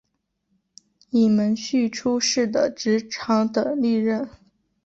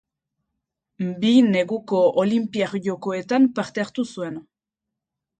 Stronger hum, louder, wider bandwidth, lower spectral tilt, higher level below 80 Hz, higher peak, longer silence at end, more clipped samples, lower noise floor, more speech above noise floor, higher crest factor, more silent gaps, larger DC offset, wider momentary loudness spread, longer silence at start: neither; about the same, -22 LUFS vs -21 LUFS; second, 8 kHz vs 9 kHz; second, -4.5 dB/octave vs -6.5 dB/octave; about the same, -64 dBFS vs -68 dBFS; about the same, -8 dBFS vs -6 dBFS; second, 0.55 s vs 1 s; neither; second, -74 dBFS vs -85 dBFS; second, 52 dB vs 64 dB; about the same, 14 dB vs 18 dB; neither; neither; second, 6 LU vs 13 LU; first, 1.15 s vs 1 s